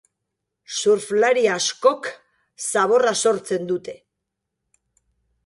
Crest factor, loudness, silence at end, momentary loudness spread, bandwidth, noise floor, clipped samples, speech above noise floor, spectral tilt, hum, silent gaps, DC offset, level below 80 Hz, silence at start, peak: 20 dB; -20 LUFS; 1.5 s; 12 LU; 11.5 kHz; -81 dBFS; under 0.1%; 61 dB; -2.5 dB/octave; none; none; under 0.1%; -70 dBFS; 0.7 s; -4 dBFS